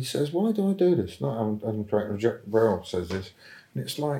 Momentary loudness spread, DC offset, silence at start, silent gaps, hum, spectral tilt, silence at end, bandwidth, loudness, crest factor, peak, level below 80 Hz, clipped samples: 11 LU; under 0.1%; 0 s; none; none; -6.5 dB/octave; 0 s; 16.5 kHz; -27 LUFS; 16 dB; -10 dBFS; -64 dBFS; under 0.1%